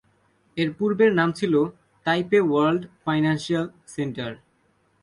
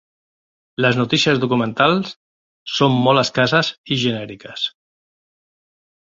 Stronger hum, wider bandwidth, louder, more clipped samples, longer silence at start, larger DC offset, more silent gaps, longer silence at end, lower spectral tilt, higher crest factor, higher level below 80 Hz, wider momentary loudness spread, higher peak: neither; first, 11.5 kHz vs 7.8 kHz; second, -23 LUFS vs -18 LUFS; neither; second, 0.55 s vs 0.8 s; neither; second, none vs 2.16-2.66 s, 3.78-3.84 s; second, 0.65 s vs 1.45 s; first, -6.5 dB/octave vs -5 dB/octave; about the same, 16 dB vs 18 dB; about the same, -62 dBFS vs -58 dBFS; about the same, 12 LU vs 12 LU; second, -8 dBFS vs -2 dBFS